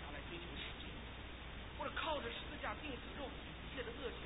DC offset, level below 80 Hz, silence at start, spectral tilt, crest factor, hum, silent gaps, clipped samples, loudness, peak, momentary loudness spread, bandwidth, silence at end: under 0.1%; -54 dBFS; 0 s; -2 dB/octave; 18 dB; none; none; under 0.1%; -46 LUFS; -30 dBFS; 9 LU; 3.9 kHz; 0 s